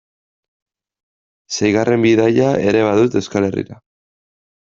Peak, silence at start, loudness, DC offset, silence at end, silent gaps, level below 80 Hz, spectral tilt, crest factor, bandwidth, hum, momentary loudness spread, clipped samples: 0 dBFS; 1.5 s; -15 LUFS; under 0.1%; 0.95 s; none; -54 dBFS; -6 dB/octave; 16 dB; 7.6 kHz; none; 11 LU; under 0.1%